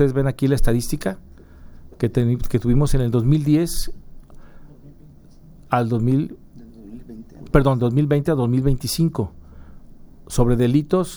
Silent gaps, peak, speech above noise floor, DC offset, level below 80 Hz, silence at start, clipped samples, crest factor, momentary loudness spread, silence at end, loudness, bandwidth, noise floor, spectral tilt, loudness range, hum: none; -2 dBFS; 27 dB; under 0.1%; -30 dBFS; 0 s; under 0.1%; 20 dB; 15 LU; 0 s; -20 LUFS; over 20 kHz; -45 dBFS; -7 dB/octave; 5 LU; none